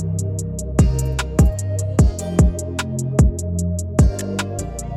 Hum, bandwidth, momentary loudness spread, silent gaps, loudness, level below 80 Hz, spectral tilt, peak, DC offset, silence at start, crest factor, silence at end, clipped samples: none; 14.5 kHz; 7 LU; none; -20 LUFS; -22 dBFS; -6 dB/octave; -2 dBFS; under 0.1%; 0 s; 16 dB; 0 s; under 0.1%